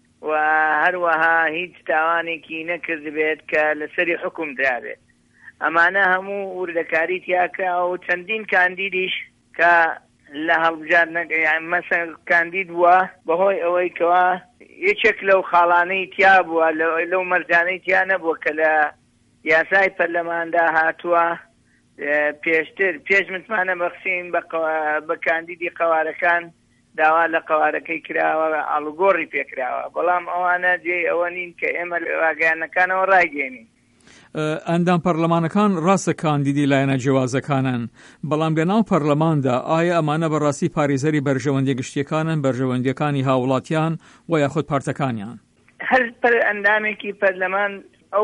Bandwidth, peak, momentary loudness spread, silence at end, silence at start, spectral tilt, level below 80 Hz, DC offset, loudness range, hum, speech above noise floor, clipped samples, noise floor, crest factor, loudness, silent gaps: 11 kHz; -4 dBFS; 9 LU; 0 s; 0.2 s; -6 dB/octave; -62 dBFS; under 0.1%; 4 LU; none; 39 dB; under 0.1%; -58 dBFS; 16 dB; -19 LUFS; none